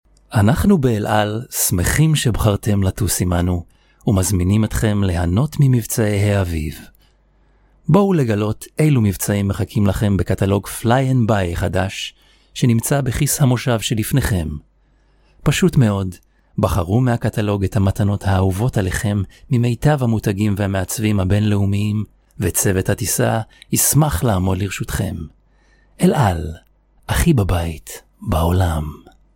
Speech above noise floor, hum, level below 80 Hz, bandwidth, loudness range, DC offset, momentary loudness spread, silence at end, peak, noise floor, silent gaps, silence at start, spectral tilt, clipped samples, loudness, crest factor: 39 dB; none; -34 dBFS; 17 kHz; 2 LU; under 0.1%; 9 LU; 0.4 s; 0 dBFS; -56 dBFS; none; 0.3 s; -5.5 dB/octave; under 0.1%; -18 LUFS; 18 dB